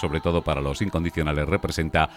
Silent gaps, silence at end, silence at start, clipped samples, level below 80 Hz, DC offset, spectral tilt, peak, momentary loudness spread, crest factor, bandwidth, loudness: none; 0 s; 0 s; under 0.1%; -34 dBFS; under 0.1%; -6 dB/octave; -6 dBFS; 2 LU; 18 dB; 16 kHz; -25 LUFS